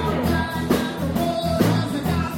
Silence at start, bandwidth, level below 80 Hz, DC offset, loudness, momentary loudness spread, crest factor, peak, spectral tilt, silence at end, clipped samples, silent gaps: 0 s; 17.5 kHz; -38 dBFS; under 0.1%; -22 LUFS; 3 LU; 16 dB; -6 dBFS; -6 dB/octave; 0 s; under 0.1%; none